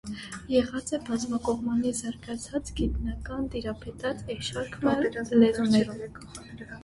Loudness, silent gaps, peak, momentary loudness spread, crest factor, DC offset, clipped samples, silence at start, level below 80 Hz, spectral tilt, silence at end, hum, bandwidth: -28 LUFS; none; -8 dBFS; 16 LU; 20 dB; under 0.1%; under 0.1%; 0.05 s; -44 dBFS; -5 dB/octave; 0 s; none; 11.5 kHz